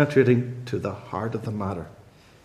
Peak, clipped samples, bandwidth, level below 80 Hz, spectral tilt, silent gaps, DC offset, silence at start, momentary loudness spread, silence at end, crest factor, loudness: -6 dBFS; under 0.1%; 12 kHz; -60 dBFS; -8 dB/octave; none; under 0.1%; 0 s; 13 LU; 0.45 s; 20 dB; -26 LUFS